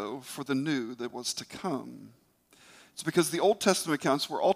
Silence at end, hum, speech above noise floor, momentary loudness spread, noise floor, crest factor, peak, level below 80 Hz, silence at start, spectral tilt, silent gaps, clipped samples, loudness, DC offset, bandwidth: 0 s; none; 30 dB; 13 LU; -60 dBFS; 20 dB; -10 dBFS; -74 dBFS; 0 s; -4 dB/octave; none; under 0.1%; -30 LUFS; under 0.1%; 16 kHz